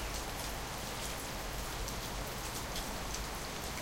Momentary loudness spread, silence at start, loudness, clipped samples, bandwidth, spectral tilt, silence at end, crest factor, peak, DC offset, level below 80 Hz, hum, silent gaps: 1 LU; 0 s; -40 LUFS; under 0.1%; 17 kHz; -3 dB/octave; 0 s; 18 dB; -22 dBFS; under 0.1%; -46 dBFS; none; none